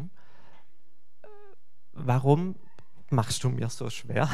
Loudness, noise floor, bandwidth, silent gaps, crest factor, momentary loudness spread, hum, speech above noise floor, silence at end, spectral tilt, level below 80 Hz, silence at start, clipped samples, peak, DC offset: -28 LUFS; -73 dBFS; 13.5 kHz; none; 24 dB; 20 LU; none; 47 dB; 0 s; -6 dB/octave; -62 dBFS; 0 s; under 0.1%; -6 dBFS; 2%